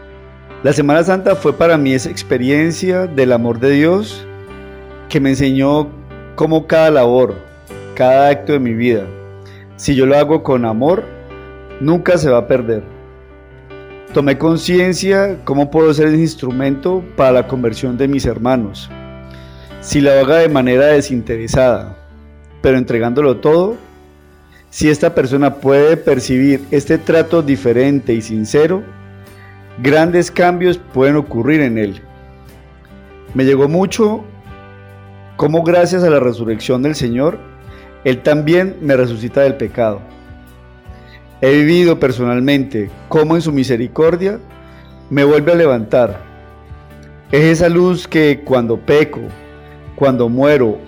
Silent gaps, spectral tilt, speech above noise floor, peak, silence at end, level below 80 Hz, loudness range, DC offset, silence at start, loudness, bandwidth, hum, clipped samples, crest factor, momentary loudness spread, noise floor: none; -6.5 dB/octave; 31 dB; 0 dBFS; 0 s; -40 dBFS; 3 LU; under 0.1%; 0 s; -13 LUFS; over 20 kHz; none; under 0.1%; 12 dB; 14 LU; -43 dBFS